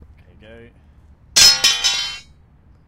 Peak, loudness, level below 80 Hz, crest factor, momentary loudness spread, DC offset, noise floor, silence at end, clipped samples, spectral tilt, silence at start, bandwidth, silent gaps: 0 dBFS; -12 LUFS; -46 dBFS; 20 dB; 17 LU; under 0.1%; -50 dBFS; 0.65 s; under 0.1%; 2 dB/octave; 1.35 s; 17 kHz; none